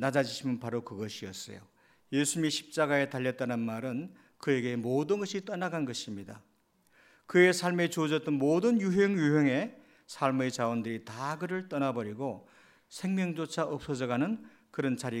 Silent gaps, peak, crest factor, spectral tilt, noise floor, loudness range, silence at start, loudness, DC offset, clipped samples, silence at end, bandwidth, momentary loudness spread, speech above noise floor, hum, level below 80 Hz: none; -10 dBFS; 22 dB; -5 dB/octave; -68 dBFS; 7 LU; 0 s; -31 LUFS; under 0.1%; under 0.1%; 0 s; 16 kHz; 13 LU; 37 dB; none; -72 dBFS